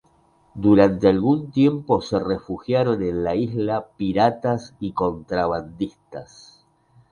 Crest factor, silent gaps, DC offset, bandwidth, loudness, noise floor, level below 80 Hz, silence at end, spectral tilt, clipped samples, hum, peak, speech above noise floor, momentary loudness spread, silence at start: 20 dB; none; under 0.1%; 9.8 kHz; -21 LUFS; -59 dBFS; -48 dBFS; 0.9 s; -8 dB/octave; under 0.1%; none; -2 dBFS; 38 dB; 13 LU; 0.55 s